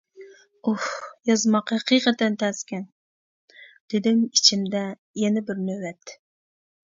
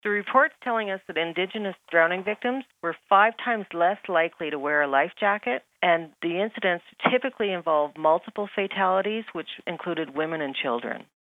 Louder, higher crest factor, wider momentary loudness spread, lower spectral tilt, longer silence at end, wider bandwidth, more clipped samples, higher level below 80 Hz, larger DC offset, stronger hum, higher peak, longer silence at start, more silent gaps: about the same, -23 LUFS vs -25 LUFS; about the same, 22 dB vs 22 dB; first, 16 LU vs 9 LU; second, -3.5 dB/octave vs -6.5 dB/octave; first, 0.7 s vs 0.3 s; first, 7.8 kHz vs 4.4 kHz; neither; first, -72 dBFS vs -80 dBFS; neither; neither; about the same, -2 dBFS vs -2 dBFS; first, 0.2 s vs 0.05 s; first, 2.92-3.48 s, 3.80-3.88 s, 4.99-5.14 s vs none